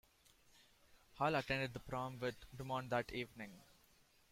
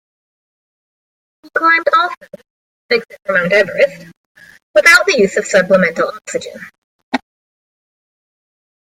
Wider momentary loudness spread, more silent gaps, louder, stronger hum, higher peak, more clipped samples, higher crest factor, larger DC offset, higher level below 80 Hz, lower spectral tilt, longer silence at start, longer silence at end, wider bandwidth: about the same, 14 LU vs 16 LU; second, none vs 2.17-2.21 s, 2.50-2.89 s, 4.17-4.35 s, 4.63-4.74 s, 6.78-7.12 s; second, -42 LUFS vs -13 LUFS; neither; second, -24 dBFS vs 0 dBFS; neither; about the same, 20 dB vs 16 dB; neither; second, -66 dBFS vs -58 dBFS; first, -5.5 dB/octave vs -3.5 dB/octave; second, 0.9 s vs 1.55 s; second, 0.65 s vs 1.8 s; about the same, 16.5 kHz vs 16 kHz